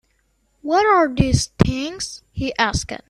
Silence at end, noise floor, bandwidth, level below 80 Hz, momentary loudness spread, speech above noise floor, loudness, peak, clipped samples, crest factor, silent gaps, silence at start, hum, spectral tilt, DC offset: 0.1 s; -65 dBFS; 13.5 kHz; -36 dBFS; 13 LU; 45 dB; -19 LUFS; 0 dBFS; under 0.1%; 20 dB; none; 0.65 s; none; -5 dB/octave; under 0.1%